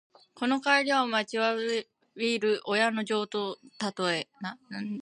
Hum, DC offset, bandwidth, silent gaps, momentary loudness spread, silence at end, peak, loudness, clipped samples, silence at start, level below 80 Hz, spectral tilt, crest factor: none; under 0.1%; 11 kHz; none; 13 LU; 0 s; -10 dBFS; -29 LUFS; under 0.1%; 0.35 s; -82 dBFS; -3.5 dB/octave; 20 dB